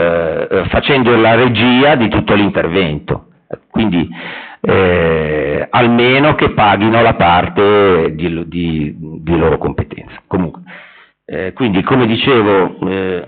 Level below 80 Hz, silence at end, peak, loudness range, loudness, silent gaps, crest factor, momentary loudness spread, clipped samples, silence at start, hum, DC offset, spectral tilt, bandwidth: -36 dBFS; 0 s; -2 dBFS; 6 LU; -12 LUFS; none; 12 dB; 13 LU; under 0.1%; 0 s; none; under 0.1%; -4.5 dB/octave; 4.6 kHz